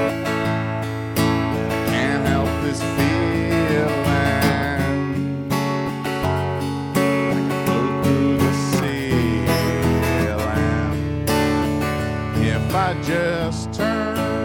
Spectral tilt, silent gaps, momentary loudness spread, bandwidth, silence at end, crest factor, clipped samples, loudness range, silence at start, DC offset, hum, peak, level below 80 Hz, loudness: -6 dB/octave; none; 5 LU; 17.5 kHz; 0 s; 16 dB; under 0.1%; 2 LU; 0 s; under 0.1%; none; -4 dBFS; -36 dBFS; -20 LUFS